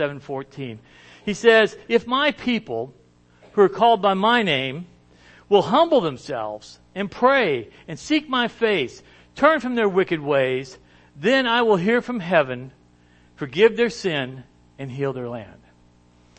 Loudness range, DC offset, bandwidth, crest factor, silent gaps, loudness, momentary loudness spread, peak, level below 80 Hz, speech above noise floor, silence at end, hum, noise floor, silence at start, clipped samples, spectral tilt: 4 LU; under 0.1%; 8.6 kHz; 20 dB; none; -20 LUFS; 17 LU; -2 dBFS; -58 dBFS; 34 dB; 0.9 s; 60 Hz at -50 dBFS; -55 dBFS; 0 s; under 0.1%; -5.5 dB/octave